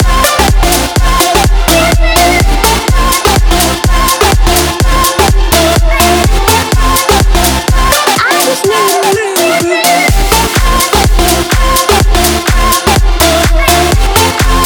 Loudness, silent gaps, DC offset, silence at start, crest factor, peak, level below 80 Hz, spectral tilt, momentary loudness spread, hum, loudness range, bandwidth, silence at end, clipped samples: -8 LUFS; none; under 0.1%; 0 s; 8 dB; 0 dBFS; -12 dBFS; -3.5 dB/octave; 2 LU; none; 0 LU; over 20 kHz; 0 s; 0.6%